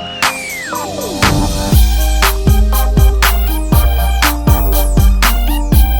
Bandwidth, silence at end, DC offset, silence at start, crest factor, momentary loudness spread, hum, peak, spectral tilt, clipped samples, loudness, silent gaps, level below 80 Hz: over 20 kHz; 0 s; under 0.1%; 0 s; 10 dB; 6 LU; none; 0 dBFS; -4.5 dB/octave; under 0.1%; -13 LUFS; none; -12 dBFS